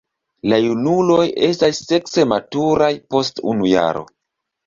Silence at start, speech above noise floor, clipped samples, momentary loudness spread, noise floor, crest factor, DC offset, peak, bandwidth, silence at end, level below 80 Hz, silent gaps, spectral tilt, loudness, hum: 0.45 s; 62 dB; under 0.1%; 5 LU; -79 dBFS; 16 dB; under 0.1%; -2 dBFS; 7.6 kHz; 0.65 s; -54 dBFS; none; -5.5 dB/octave; -17 LUFS; none